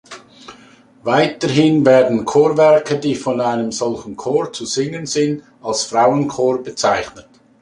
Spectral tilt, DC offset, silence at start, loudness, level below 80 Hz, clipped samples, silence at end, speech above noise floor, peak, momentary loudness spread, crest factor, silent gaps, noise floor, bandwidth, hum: -5 dB/octave; under 0.1%; 0.1 s; -16 LUFS; -56 dBFS; under 0.1%; 0.4 s; 30 dB; -2 dBFS; 10 LU; 16 dB; none; -46 dBFS; 11.5 kHz; none